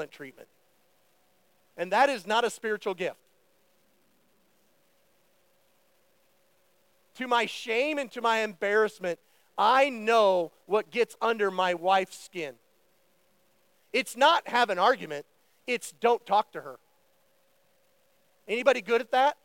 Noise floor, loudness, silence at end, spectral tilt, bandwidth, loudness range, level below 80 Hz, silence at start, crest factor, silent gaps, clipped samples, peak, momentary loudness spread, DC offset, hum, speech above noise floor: -69 dBFS; -27 LUFS; 0.1 s; -3 dB/octave; 17 kHz; 8 LU; -88 dBFS; 0 s; 20 dB; none; under 0.1%; -8 dBFS; 16 LU; under 0.1%; none; 42 dB